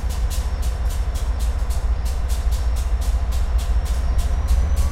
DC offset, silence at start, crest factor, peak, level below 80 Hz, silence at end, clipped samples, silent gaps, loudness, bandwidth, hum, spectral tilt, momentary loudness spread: under 0.1%; 0 s; 12 dB; -8 dBFS; -20 dBFS; 0 s; under 0.1%; none; -24 LUFS; 15 kHz; none; -5.5 dB/octave; 3 LU